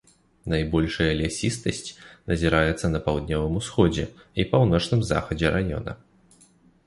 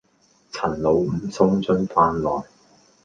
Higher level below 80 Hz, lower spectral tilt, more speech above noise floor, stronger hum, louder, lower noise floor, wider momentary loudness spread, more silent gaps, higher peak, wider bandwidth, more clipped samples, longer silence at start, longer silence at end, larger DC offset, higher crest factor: first, -38 dBFS vs -48 dBFS; second, -6 dB/octave vs -7.5 dB/octave; second, 34 dB vs 40 dB; neither; second, -24 LUFS vs -21 LUFS; about the same, -57 dBFS vs -60 dBFS; first, 12 LU vs 9 LU; neither; about the same, -6 dBFS vs -4 dBFS; first, 11.5 kHz vs 7.6 kHz; neither; about the same, 0.45 s vs 0.55 s; first, 0.9 s vs 0.6 s; neither; about the same, 20 dB vs 20 dB